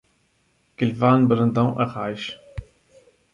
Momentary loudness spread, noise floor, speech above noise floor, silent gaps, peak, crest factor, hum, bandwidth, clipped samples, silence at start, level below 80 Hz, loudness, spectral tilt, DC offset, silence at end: 20 LU; -65 dBFS; 45 dB; none; -4 dBFS; 20 dB; none; 7.2 kHz; under 0.1%; 0.8 s; -48 dBFS; -21 LUFS; -8.5 dB/octave; under 0.1%; 0.7 s